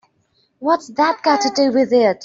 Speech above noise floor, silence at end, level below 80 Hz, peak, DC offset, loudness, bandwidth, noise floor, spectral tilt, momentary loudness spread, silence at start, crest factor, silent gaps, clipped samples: 47 dB; 0 s; -64 dBFS; -2 dBFS; under 0.1%; -17 LUFS; 7.8 kHz; -63 dBFS; -3.5 dB/octave; 5 LU; 0.6 s; 14 dB; none; under 0.1%